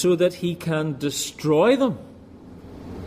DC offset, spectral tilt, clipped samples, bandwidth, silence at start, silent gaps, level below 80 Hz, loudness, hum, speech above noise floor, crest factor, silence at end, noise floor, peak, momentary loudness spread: under 0.1%; -5.5 dB/octave; under 0.1%; 15.5 kHz; 0 s; none; -54 dBFS; -22 LUFS; none; 22 dB; 16 dB; 0 s; -43 dBFS; -6 dBFS; 22 LU